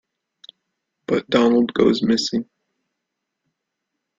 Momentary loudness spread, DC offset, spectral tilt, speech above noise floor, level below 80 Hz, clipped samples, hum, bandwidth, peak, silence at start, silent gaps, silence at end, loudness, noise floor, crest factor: 14 LU; under 0.1%; -5 dB/octave; 62 dB; -58 dBFS; under 0.1%; none; 7.6 kHz; -2 dBFS; 1.1 s; none; 1.75 s; -19 LUFS; -80 dBFS; 20 dB